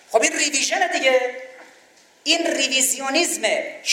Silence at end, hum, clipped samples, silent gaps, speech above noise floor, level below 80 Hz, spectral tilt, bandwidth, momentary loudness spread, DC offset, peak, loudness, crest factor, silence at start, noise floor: 0 s; none; under 0.1%; none; 32 dB; -74 dBFS; 1 dB/octave; 16.5 kHz; 6 LU; under 0.1%; -2 dBFS; -19 LUFS; 18 dB; 0.1 s; -53 dBFS